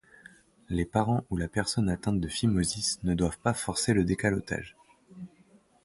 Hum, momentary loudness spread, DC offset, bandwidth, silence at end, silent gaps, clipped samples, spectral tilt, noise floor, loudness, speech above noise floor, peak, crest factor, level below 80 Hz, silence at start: none; 15 LU; under 0.1%; 11.5 kHz; 0.6 s; none; under 0.1%; -5 dB/octave; -61 dBFS; -29 LUFS; 33 dB; -10 dBFS; 20 dB; -46 dBFS; 0.7 s